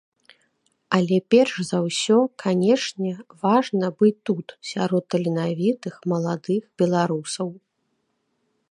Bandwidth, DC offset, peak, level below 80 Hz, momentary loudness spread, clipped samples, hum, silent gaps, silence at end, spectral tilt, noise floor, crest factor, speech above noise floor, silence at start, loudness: 11 kHz; under 0.1%; -4 dBFS; -70 dBFS; 10 LU; under 0.1%; none; none; 1.15 s; -6 dB/octave; -73 dBFS; 18 dB; 51 dB; 0.9 s; -22 LUFS